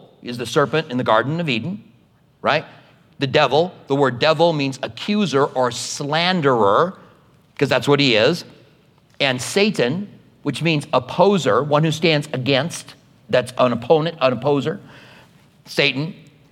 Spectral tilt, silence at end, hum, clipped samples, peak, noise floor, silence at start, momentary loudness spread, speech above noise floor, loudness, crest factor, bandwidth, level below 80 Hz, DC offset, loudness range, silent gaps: -5 dB/octave; 0.4 s; none; under 0.1%; -2 dBFS; -55 dBFS; 0.25 s; 11 LU; 37 dB; -19 LUFS; 18 dB; 15.5 kHz; -64 dBFS; under 0.1%; 3 LU; none